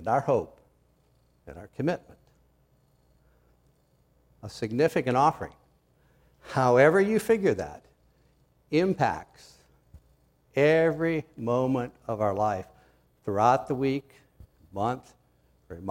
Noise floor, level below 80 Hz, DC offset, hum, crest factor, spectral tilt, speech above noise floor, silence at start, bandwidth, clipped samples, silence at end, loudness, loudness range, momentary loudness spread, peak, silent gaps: -66 dBFS; -60 dBFS; under 0.1%; none; 22 dB; -6.5 dB/octave; 40 dB; 0 s; 16 kHz; under 0.1%; 0 s; -26 LUFS; 13 LU; 18 LU; -8 dBFS; none